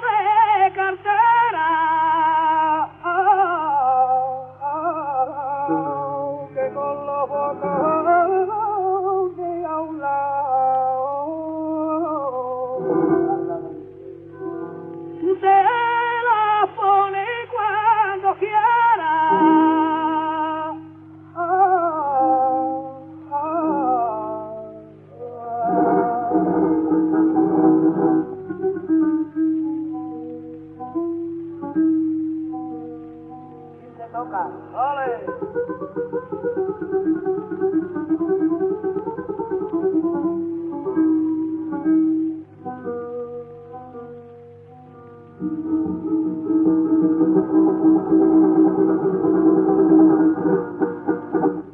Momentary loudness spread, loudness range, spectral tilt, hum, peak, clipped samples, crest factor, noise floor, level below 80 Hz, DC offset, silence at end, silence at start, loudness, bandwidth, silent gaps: 16 LU; 9 LU; -10 dB/octave; 50 Hz at -50 dBFS; -4 dBFS; under 0.1%; 16 dB; -43 dBFS; -62 dBFS; under 0.1%; 0 s; 0 s; -20 LUFS; 3.6 kHz; none